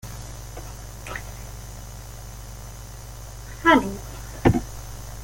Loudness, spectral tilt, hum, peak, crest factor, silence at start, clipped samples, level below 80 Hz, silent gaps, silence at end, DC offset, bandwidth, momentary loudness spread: -23 LUFS; -5.5 dB/octave; 50 Hz at -40 dBFS; -4 dBFS; 24 dB; 0.05 s; under 0.1%; -40 dBFS; none; 0 s; under 0.1%; 17 kHz; 20 LU